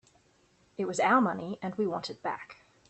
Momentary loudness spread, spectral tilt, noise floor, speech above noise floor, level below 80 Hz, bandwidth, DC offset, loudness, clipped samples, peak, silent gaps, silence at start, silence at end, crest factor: 17 LU; -5 dB/octave; -66 dBFS; 36 dB; -72 dBFS; 8.8 kHz; under 0.1%; -30 LUFS; under 0.1%; -12 dBFS; none; 0.8 s; 0.35 s; 20 dB